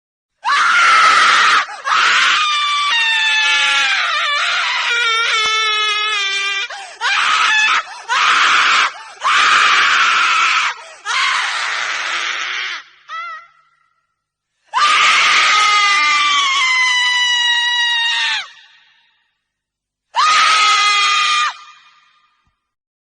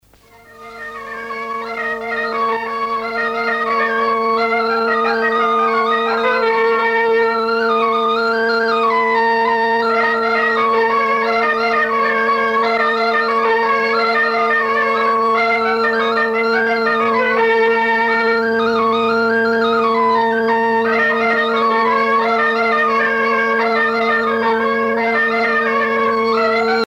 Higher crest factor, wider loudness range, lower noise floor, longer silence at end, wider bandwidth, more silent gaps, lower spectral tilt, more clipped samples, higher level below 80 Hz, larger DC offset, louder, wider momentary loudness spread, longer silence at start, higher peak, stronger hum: first, 16 dB vs 10 dB; first, 6 LU vs 2 LU; first, -80 dBFS vs -46 dBFS; first, 1.3 s vs 0 s; first, 10 kHz vs 8.4 kHz; neither; second, 3 dB/octave vs -4.5 dB/octave; neither; second, -64 dBFS vs -56 dBFS; neither; first, -12 LUFS vs -15 LUFS; first, 11 LU vs 4 LU; about the same, 0.45 s vs 0.5 s; first, 0 dBFS vs -4 dBFS; neither